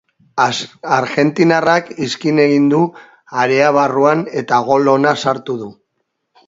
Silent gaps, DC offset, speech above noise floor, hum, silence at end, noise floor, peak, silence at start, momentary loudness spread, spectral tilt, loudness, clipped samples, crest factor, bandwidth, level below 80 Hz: none; under 0.1%; 57 dB; none; 0.75 s; -71 dBFS; 0 dBFS; 0.35 s; 10 LU; -5.5 dB/octave; -14 LUFS; under 0.1%; 14 dB; 7.8 kHz; -62 dBFS